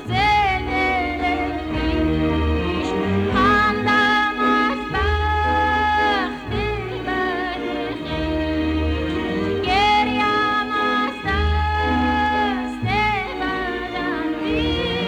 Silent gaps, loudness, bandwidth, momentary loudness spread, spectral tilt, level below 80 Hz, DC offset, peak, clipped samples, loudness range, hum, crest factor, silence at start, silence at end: none; -20 LUFS; 11 kHz; 8 LU; -6 dB/octave; -30 dBFS; under 0.1%; -8 dBFS; under 0.1%; 4 LU; none; 12 dB; 0 s; 0 s